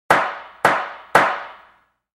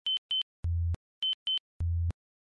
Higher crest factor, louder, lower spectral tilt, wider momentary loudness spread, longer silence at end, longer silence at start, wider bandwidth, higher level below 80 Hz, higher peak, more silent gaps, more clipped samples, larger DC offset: first, 20 dB vs 8 dB; first, -19 LUFS vs -32 LUFS; second, -3.5 dB/octave vs -5 dB/octave; first, 12 LU vs 7 LU; first, 0.65 s vs 0.4 s; about the same, 0.1 s vs 0.05 s; first, 16.5 kHz vs 5.4 kHz; second, -56 dBFS vs -46 dBFS; first, 0 dBFS vs -24 dBFS; second, none vs 0.18-0.29 s, 0.43-0.63 s, 0.96-1.22 s, 1.34-1.46 s, 1.60-1.80 s; neither; neither